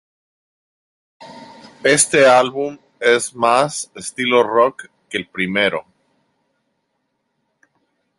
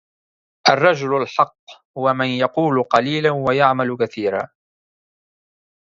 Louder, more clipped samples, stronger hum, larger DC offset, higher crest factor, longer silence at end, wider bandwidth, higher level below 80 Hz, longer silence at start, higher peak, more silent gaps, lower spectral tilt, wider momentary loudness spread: about the same, -16 LUFS vs -18 LUFS; neither; neither; neither; about the same, 20 dB vs 20 dB; first, 2.4 s vs 1.45 s; first, 12 kHz vs 7.6 kHz; about the same, -62 dBFS vs -62 dBFS; first, 1.2 s vs 0.65 s; about the same, 0 dBFS vs 0 dBFS; second, none vs 1.59-1.67 s, 1.85-1.94 s; second, -2.5 dB/octave vs -5.5 dB/octave; first, 15 LU vs 7 LU